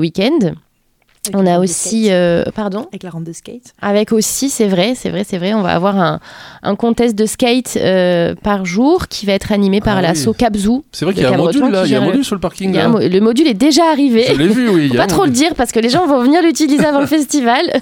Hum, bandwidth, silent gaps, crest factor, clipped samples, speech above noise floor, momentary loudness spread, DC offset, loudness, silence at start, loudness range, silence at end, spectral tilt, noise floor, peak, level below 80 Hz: none; 17.5 kHz; none; 12 dB; under 0.1%; 44 dB; 8 LU; under 0.1%; -13 LUFS; 0 s; 4 LU; 0 s; -5 dB/octave; -57 dBFS; 0 dBFS; -40 dBFS